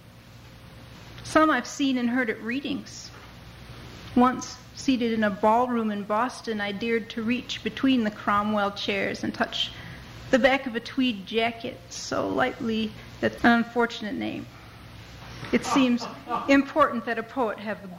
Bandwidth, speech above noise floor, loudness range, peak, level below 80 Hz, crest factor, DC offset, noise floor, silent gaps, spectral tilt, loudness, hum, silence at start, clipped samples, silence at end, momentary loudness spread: 15.5 kHz; 22 dB; 2 LU; -8 dBFS; -54 dBFS; 20 dB; under 0.1%; -48 dBFS; none; -4.5 dB/octave; -25 LUFS; none; 0.15 s; under 0.1%; 0 s; 20 LU